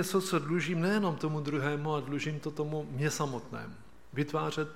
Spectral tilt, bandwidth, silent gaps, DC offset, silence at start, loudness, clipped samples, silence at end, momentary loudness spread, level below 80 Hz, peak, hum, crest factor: -5.5 dB/octave; 16 kHz; none; 0.3%; 0 s; -33 LUFS; under 0.1%; 0 s; 10 LU; -64 dBFS; -14 dBFS; none; 18 dB